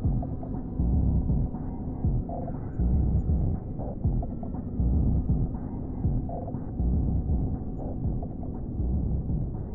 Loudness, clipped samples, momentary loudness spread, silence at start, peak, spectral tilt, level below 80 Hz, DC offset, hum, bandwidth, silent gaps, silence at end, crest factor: -30 LUFS; under 0.1%; 8 LU; 0 s; -14 dBFS; -15 dB/octave; -30 dBFS; under 0.1%; none; 1.8 kHz; none; 0 s; 12 dB